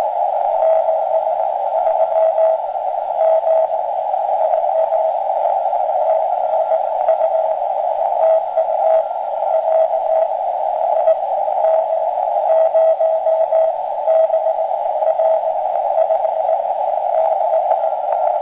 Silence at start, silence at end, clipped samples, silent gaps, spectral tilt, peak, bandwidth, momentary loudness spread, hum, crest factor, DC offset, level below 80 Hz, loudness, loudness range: 0 s; 0 s; under 0.1%; none; -5.5 dB/octave; -4 dBFS; 3.9 kHz; 4 LU; none; 12 dB; under 0.1%; -66 dBFS; -17 LUFS; 1 LU